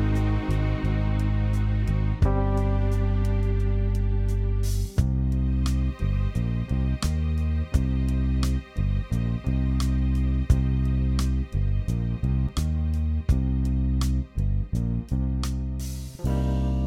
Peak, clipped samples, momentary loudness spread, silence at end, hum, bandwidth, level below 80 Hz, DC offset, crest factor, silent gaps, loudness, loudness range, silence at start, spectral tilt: -8 dBFS; under 0.1%; 3 LU; 0 s; none; 14 kHz; -26 dBFS; under 0.1%; 16 dB; none; -26 LUFS; 1 LU; 0 s; -7.5 dB/octave